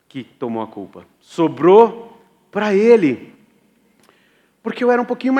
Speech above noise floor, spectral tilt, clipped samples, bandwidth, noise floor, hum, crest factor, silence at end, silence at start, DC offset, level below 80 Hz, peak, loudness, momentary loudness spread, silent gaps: 42 dB; -7 dB/octave; under 0.1%; 8.8 kHz; -58 dBFS; none; 18 dB; 0 s; 0.15 s; under 0.1%; -72 dBFS; 0 dBFS; -15 LUFS; 22 LU; none